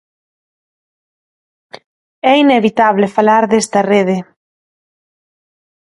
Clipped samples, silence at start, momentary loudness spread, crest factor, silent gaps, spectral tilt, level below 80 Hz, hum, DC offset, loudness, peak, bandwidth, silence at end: under 0.1%; 1.75 s; 7 LU; 16 dB; 1.86-2.22 s; -5 dB/octave; -62 dBFS; none; under 0.1%; -12 LUFS; 0 dBFS; 11.5 kHz; 1.7 s